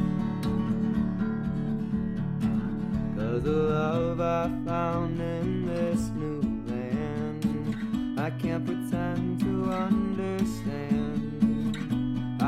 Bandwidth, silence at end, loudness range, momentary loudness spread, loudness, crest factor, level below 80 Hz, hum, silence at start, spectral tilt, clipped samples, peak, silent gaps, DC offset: 14 kHz; 0 s; 2 LU; 4 LU; -29 LUFS; 14 dB; -44 dBFS; none; 0 s; -8 dB/octave; under 0.1%; -12 dBFS; none; under 0.1%